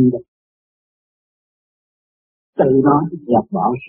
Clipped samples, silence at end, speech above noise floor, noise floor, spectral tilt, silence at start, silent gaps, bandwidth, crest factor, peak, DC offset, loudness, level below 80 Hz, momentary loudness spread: under 0.1%; 0 s; over 75 dB; under -90 dBFS; -6.5 dB/octave; 0 s; 0.28-2.53 s; 3.4 kHz; 18 dB; -2 dBFS; under 0.1%; -16 LUFS; -56 dBFS; 12 LU